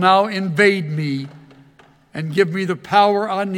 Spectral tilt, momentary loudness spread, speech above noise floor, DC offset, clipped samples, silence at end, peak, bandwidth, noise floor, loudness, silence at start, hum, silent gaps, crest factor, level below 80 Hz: -6 dB/octave; 13 LU; 34 dB; under 0.1%; under 0.1%; 0 s; 0 dBFS; 15.5 kHz; -51 dBFS; -18 LUFS; 0 s; none; none; 18 dB; -66 dBFS